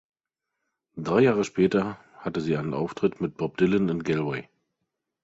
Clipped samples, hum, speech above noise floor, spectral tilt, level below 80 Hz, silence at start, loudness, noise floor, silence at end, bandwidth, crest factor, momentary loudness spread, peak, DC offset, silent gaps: under 0.1%; none; 61 dB; -7 dB/octave; -58 dBFS; 0.95 s; -26 LUFS; -85 dBFS; 0.8 s; 8 kHz; 18 dB; 12 LU; -8 dBFS; under 0.1%; none